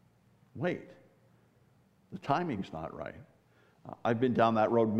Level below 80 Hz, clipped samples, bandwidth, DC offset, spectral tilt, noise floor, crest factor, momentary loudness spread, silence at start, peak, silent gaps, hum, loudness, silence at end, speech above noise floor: -68 dBFS; under 0.1%; 8.2 kHz; under 0.1%; -8 dB/octave; -66 dBFS; 20 dB; 23 LU; 0.55 s; -12 dBFS; none; none; -32 LUFS; 0 s; 35 dB